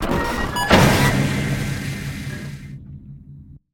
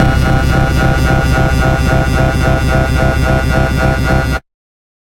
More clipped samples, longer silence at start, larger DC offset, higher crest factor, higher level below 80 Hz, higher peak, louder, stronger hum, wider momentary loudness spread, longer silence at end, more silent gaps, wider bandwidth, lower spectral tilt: neither; about the same, 0 s vs 0 s; neither; first, 20 dB vs 12 dB; second, -32 dBFS vs -16 dBFS; about the same, 0 dBFS vs 0 dBFS; second, -19 LUFS vs -12 LUFS; neither; first, 24 LU vs 1 LU; second, 0.15 s vs 0.7 s; neither; about the same, 17.5 kHz vs 16.5 kHz; second, -5 dB/octave vs -6.5 dB/octave